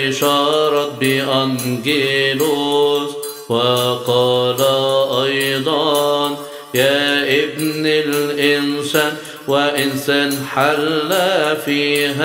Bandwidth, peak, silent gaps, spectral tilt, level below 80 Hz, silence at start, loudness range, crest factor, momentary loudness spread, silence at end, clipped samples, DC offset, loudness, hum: 16.5 kHz; 0 dBFS; none; -4 dB/octave; -62 dBFS; 0 s; 1 LU; 16 dB; 5 LU; 0 s; under 0.1%; under 0.1%; -16 LUFS; none